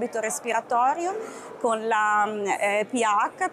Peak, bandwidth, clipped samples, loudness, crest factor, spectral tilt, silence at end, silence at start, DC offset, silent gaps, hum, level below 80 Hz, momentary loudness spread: -12 dBFS; 15.5 kHz; under 0.1%; -24 LUFS; 12 dB; -2.5 dB/octave; 0 s; 0 s; under 0.1%; none; none; -78 dBFS; 7 LU